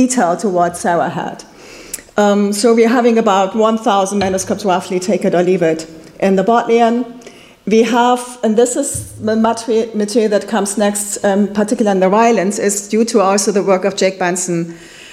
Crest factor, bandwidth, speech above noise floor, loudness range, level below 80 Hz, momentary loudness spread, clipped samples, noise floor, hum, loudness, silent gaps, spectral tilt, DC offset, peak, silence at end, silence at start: 14 dB; 15.5 kHz; 25 dB; 2 LU; -52 dBFS; 9 LU; under 0.1%; -38 dBFS; none; -14 LUFS; none; -4.5 dB/octave; under 0.1%; 0 dBFS; 0 s; 0 s